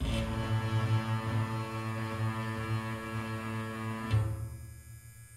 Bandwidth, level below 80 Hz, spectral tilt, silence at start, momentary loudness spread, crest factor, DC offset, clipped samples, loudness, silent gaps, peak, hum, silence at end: 14 kHz; -46 dBFS; -6.5 dB/octave; 0 s; 12 LU; 16 dB; under 0.1%; under 0.1%; -34 LUFS; none; -18 dBFS; none; 0 s